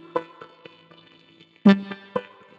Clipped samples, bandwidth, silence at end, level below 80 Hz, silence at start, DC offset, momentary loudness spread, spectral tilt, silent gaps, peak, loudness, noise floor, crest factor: under 0.1%; 5.8 kHz; 0.35 s; -72 dBFS; 0.15 s; under 0.1%; 26 LU; -8.5 dB/octave; none; 0 dBFS; -23 LUFS; -54 dBFS; 24 dB